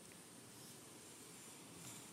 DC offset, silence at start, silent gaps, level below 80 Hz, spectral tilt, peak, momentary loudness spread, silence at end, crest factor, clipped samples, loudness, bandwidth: under 0.1%; 0 s; none; -88 dBFS; -2.5 dB/octave; -40 dBFS; 4 LU; 0 s; 18 dB; under 0.1%; -56 LUFS; 16 kHz